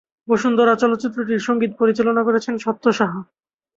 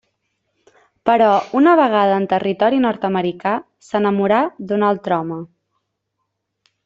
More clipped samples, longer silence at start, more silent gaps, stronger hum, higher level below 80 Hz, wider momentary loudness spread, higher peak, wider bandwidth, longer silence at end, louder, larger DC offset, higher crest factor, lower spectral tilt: neither; second, 0.3 s vs 1.05 s; neither; neither; about the same, -62 dBFS vs -62 dBFS; about the same, 7 LU vs 9 LU; about the same, -2 dBFS vs 0 dBFS; about the same, 7.8 kHz vs 7.8 kHz; second, 0.55 s vs 1.4 s; about the same, -19 LUFS vs -17 LUFS; neither; about the same, 16 dB vs 18 dB; second, -6 dB/octave vs -7.5 dB/octave